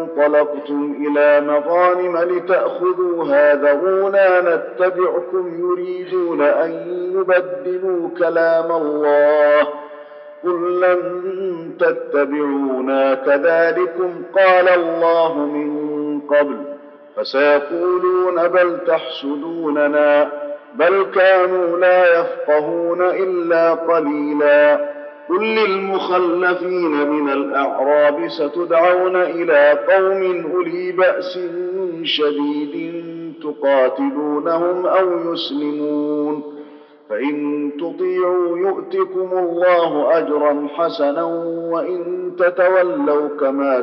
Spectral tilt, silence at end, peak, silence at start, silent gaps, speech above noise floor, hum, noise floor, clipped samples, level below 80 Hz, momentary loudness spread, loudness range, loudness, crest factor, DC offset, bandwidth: -2.5 dB/octave; 0 s; -4 dBFS; 0 s; none; 23 dB; none; -39 dBFS; under 0.1%; -88 dBFS; 10 LU; 4 LU; -17 LUFS; 14 dB; under 0.1%; 5.8 kHz